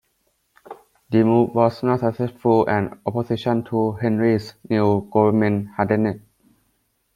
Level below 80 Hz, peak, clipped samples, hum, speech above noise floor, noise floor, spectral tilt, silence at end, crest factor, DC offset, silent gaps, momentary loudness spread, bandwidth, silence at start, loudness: -58 dBFS; -2 dBFS; under 0.1%; none; 49 dB; -68 dBFS; -9 dB/octave; 0.95 s; 18 dB; under 0.1%; none; 7 LU; 12 kHz; 0.7 s; -20 LUFS